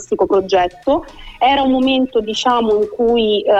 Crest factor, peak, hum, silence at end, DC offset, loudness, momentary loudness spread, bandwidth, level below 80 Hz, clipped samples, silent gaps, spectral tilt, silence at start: 12 dB; -2 dBFS; none; 0 s; under 0.1%; -15 LUFS; 4 LU; 8.2 kHz; -42 dBFS; under 0.1%; none; -4.5 dB/octave; 0 s